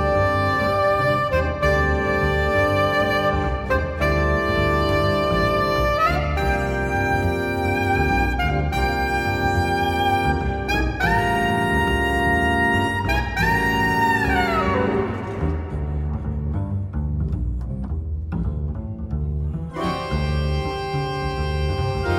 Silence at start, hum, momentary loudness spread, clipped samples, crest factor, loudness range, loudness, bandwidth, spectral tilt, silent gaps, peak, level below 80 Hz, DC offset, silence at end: 0 s; none; 8 LU; under 0.1%; 14 dB; 7 LU; -21 LUFS; 17 kHz; -6.5 dB/octave; none; -6 dBFS; -28 dBFS; under 0.1%; 0 s